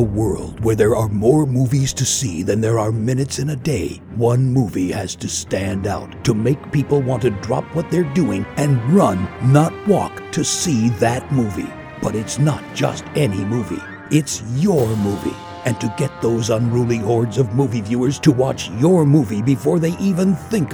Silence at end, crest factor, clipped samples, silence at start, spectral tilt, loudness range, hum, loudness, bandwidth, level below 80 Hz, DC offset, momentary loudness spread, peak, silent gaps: 0 s; 16 dB; under 0.1%; 0 s; -6 dB/octave; 3 LU; none; -18 LUFS; 20 kHz; -42 dBFS; under 0.1%; 8 LU; 0 dBFS; none